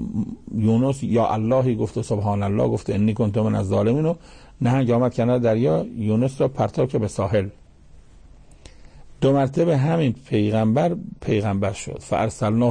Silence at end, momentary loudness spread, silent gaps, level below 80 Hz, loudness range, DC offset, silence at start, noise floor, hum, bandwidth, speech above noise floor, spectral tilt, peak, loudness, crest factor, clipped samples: 0 s; 6 LU; none; -46 dBFS; 3 LU; under 0.1%; 0 s; -47 dBFS; none; 9.8 kHz; 26 dB; -8 dB/octave; -10 dBFS; -21 LUFS; 12 dB; under 0.1%